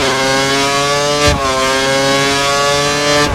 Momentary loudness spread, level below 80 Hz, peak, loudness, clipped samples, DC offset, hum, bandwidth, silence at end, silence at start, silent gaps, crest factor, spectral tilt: 1 LU; -32 dBFS; 0 dBFS; -12 LUFS; under 0.1%; under 0.1%; none; 17.5 kHz; 0 s; 0 s; none; 12 dB; -2.5 dB/octave